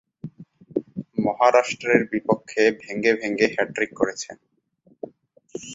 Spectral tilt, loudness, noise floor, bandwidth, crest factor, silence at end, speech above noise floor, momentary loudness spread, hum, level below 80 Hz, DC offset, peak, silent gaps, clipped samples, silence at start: -4.5 dB/octave; -22 LUFS; -60 dBFS; 8 kHz; 22 dB; 0 s; 39 dB; 22 LU; none; -64 dBFS; under 0.1%; -2 dBFS; none; under 0.1%; 0.25 s